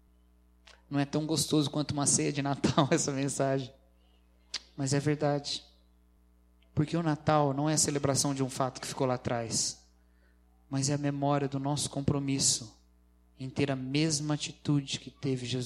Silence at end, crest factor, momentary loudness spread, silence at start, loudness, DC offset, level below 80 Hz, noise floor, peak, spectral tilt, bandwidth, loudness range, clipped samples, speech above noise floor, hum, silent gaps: 0 s; 24 dB; 9 LU; 0.9 s; -30 LUFS; under 0.1%; -60 dBFS; -63 dBFS; -8 dBFS; -4.5 dB/octave; 14 kHz; 4 LU; under 0.1%; 33 dB; 60 Hz at -60 dBFS; none